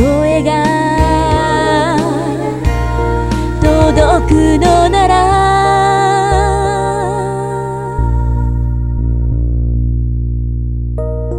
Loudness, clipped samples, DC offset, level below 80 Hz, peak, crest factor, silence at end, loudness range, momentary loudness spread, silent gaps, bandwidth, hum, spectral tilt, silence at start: -13 LUFS; under 0.1%; under 0.1%; -18 dBFS; 0 dBFS; 12 dB; 0 s; 6 LU; 9 LU; none; 11.5 kHz; none; -6.5 dB/octave; 0 s